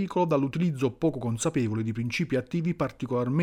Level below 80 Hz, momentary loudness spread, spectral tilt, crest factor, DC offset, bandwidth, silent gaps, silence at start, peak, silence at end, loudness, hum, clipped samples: -56 dBFS; 4 LU; -6.5 dB/octave; 14 dB; under 0.1%; 14 kHz; none; 0 s; -12 dBFS; 0 s; -28 LUFS; none; under 0.1%